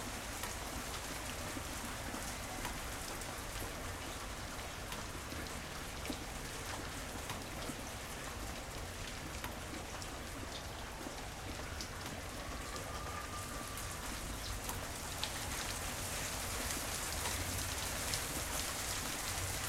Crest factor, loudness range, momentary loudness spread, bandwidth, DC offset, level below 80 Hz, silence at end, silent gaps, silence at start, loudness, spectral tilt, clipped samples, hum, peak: 24 dB; 6 LU; 7 LU; 16 kHz; under 0.1%; -50 dBFS; 0 s; none; 0 s; -41 LUFS; -2.5 dB/octave; under 0.1%; none; -18 dBFS